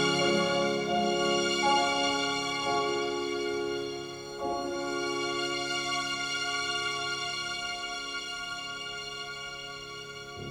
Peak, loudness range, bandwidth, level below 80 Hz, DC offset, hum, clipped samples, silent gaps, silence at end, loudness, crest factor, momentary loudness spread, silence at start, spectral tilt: -14 dBFS; 6 LU; 18.5 kHz; -62 dBFS; under 0.1%; none; under 0.1%; none; 0 s; -30 LUFS; 18 dB; 12 LU; 0 s; -3 dB/octave